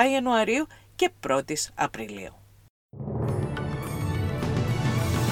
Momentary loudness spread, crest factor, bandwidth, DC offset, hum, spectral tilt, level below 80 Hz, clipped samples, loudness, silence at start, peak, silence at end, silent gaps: 13 LU; 22 dB; 17 kHz; under 0.1%; none; -5.5 dB/octave; -44 dBFS; under 0.1%; -27 LUFS; 0 s; -6 dBFS; 0 s; 2.70-2.89 s